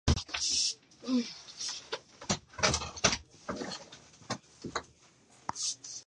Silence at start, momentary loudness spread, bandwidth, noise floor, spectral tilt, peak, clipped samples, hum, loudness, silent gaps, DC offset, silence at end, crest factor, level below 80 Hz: 0.05 s; 13 LU; 11.5 kHz; -62 dBFS; -2.5 dB/octave; -10 dBFS; under 0.1%; none; -33 LUFS; none; under 0.1%; 0.05 s; 26 dB; -46 dBFS